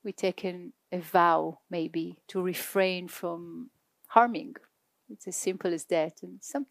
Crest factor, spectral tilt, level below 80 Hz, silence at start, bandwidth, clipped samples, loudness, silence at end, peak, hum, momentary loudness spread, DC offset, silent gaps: 26 dB; -4.5 dB/octave; -88 dBFS; 0.05 s; 15.5 kHz; under 0.1%; -30 LUFS; 0.05 s; -4 dBFS; none; 20 LU; under 0.1%; none